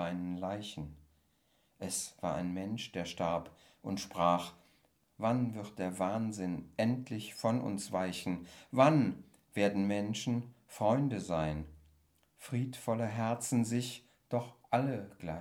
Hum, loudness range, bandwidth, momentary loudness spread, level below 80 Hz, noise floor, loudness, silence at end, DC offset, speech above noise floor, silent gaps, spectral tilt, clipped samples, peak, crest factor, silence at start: none; 6 LU; 17.5 kHz; 12 LU; -64 dBFS; -74 dBFS; -35 LUFS; 0 s; under 0.1%; 39 dB; none; -5.5 dB/octave; under 0.1%; -12 dBFS; 22 dB; 0 s